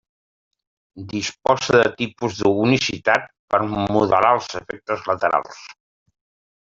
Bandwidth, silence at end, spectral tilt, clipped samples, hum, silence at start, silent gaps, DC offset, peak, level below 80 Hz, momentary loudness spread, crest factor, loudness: 7.8 kHz; 0.9 s; -5 dB/octave; under 0.1%; none; 0.95 s; 3.39-3.48 s; under 0.1%; -2 dBFS; -54 dBFS; 14 LU; 18 dB; -20 LUFS